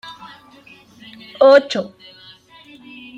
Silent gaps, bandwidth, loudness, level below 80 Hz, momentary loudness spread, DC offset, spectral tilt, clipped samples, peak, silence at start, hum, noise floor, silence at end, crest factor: none; 7.8 kHz; -14 LUFS; -68 dBFS; 27 LU; under 0.1%; -4.5 dB/octave; under 0.1%; 0 dBFS; 0.05 s; none; -46 dBFS; 1.3 s; 20 dB